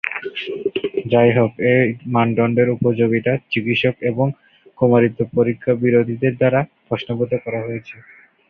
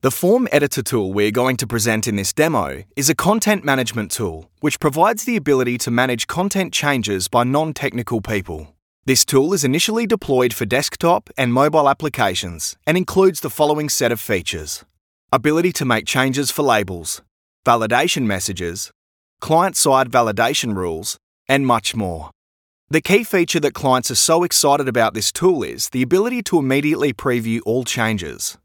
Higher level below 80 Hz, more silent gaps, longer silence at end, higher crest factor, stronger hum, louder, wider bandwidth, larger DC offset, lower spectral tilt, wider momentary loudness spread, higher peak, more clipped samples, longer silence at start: second, -54 dBFS vs -48 dBFS; second, none vs 8.82-9.03 s, 15.01-15.28 s, 17.31-17.63 s, 18.95-19.37 s, 21.23-21.45 s, 22.35-22.87 s; first, 0.5 s vs 0.1 s; about the same, 16 dB vs 18 dB; neither; about the same, -18 LUFS vs -18 LUFS; second, 5 kHz vs 19 kHz; neither; first, -9.5 dB/octave vs -4 dB/octave; about the same, 10 LU vs 9 LU; about the same, -2 dBFS vs 0 dBFS; neither; about the same, 0.05 s vs 0.05 s